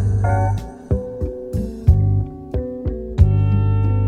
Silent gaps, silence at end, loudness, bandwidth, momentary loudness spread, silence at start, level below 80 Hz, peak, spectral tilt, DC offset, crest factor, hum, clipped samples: none; 0 s; -20 LUFS; 6.4 kHz; 11 LU; 0 s; -26 dBFS; 0 dBFS; -9.5 dB/octave; under 0.1%; 18 dB; none; under 0.1%